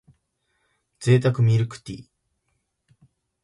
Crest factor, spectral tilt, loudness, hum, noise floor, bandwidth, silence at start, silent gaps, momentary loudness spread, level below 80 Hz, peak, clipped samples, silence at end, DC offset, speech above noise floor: 20 dB; -7.5 dB/octave; -21 LUFS; none; -74 dBFS; 11.5 kHz; 1 s; none; 20 LU; -58 dBFS; -6 dBFS; under 0.1%; 1.4 s; under 0.1%; 54 dB